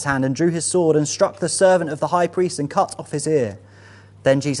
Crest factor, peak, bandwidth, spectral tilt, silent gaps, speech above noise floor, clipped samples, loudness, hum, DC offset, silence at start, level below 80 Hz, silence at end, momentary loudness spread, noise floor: 16 dB; -2 dBFS; 11.5 kHz; -5 dB/octave; none; 26 dB; under 0.1%; -19 LUFS; none; under 0.1%; 0 s; -58 dBFS; 0 s; 6 LU; -45 dBFS